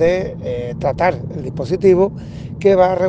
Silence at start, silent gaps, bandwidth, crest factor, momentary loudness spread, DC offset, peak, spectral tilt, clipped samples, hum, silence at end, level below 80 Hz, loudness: 0 s; none; 7.8 kHz; 16 dB; 13 LU; under 0.1%; 0 dBFS; -8 dB/octave; under 0.1%; none; 0 s; -40 dBFS; -17 LUFS